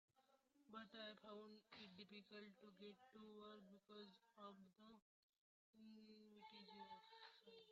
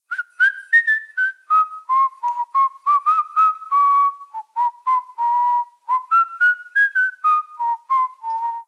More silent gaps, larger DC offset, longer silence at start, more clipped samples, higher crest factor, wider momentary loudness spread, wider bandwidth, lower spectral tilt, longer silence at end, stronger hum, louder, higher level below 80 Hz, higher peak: first, 5.02-5.29 s, 5.38-5.73 s vs none; neither; about the same, 0.15 s vs 0.1 s; neither; about the same, 18 dB vs 14 dB; about the same, 8 LU vs 9 LU; second, 7.2 kHz vs 10.5 kHz; first, -2.5 dB/octave vs 5.5 dB/octave; about the same, 0 s vs 0.05 s; neither; second, -63 LUFS vs -18 LUFS; about the same, under -90 dBFS vs under -90 dBFS; second, -46 dBFS vs -6 dBFS